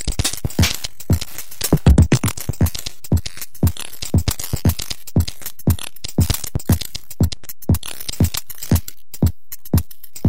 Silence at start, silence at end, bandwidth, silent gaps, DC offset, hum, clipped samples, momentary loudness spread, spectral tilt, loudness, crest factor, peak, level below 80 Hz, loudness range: 0.05 s; 0 s; 16.5 kHz; none; 5%; none; under 0.1%; 10 LU; -5 dB/octave; -21 LUFS; 18 dB; -2 dBFS; -26 dBFS; 3 LU